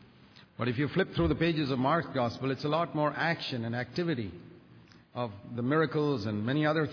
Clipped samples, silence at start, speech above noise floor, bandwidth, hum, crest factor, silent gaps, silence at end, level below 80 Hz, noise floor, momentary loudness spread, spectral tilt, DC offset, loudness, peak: under 0.1%; 0.6 s; 27 dB; 5.4 kHz; none; 16 dB; none; 0 s; -54 dBFS; -57 dBFS; 10 LU; -7.5 dB/octave; under 0.1%; -31 LUFS; -14 dBFS